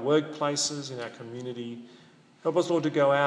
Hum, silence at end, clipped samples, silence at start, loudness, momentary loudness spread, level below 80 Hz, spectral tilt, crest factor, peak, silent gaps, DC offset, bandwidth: none; 0 s; under 0.1%; 0 s; -29 LUFS; 14 LU; -84 dBFS; -4 dB/octave; 18 dB; -10 dBFS; none; under 0.1%; 10.5 kHz